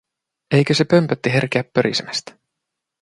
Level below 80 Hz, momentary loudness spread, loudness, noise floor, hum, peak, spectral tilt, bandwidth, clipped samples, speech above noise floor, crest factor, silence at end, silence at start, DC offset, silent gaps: -58 dBFS; 8 LU; -18 LUFS; -81 dBFS; none; -2 dBFS; -5.5 dB/octave; 11.5 kHz; under 0.1%; 63 dB; 18 dB; 0.7 s; 0.5 s; under 0.1%; none